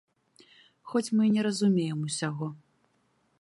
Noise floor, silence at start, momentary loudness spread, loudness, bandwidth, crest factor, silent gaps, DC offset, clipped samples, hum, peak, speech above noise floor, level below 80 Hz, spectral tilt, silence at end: -71 dBFS; 0.85 s; 9 LU; -28 LUFS; 11.5 kHz; 16 dB; none; under 0.1%; under 0.1%; none; -14 dBFS; 44 dB; -78 dBFS; -5.5 dB/octave; 0.85 s